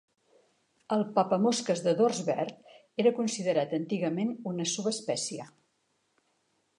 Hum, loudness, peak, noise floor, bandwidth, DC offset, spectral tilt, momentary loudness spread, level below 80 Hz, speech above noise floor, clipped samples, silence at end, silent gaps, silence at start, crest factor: none; -29 LUFS; -12 dBFS; -75 dBFS; 11.5 kHz; under 0.1%; -4.5 dB/octave; 8 LU; -82 dBFS; 46 dB; under 0.1%; 1.3 s; none; 0.9 s; 18 dB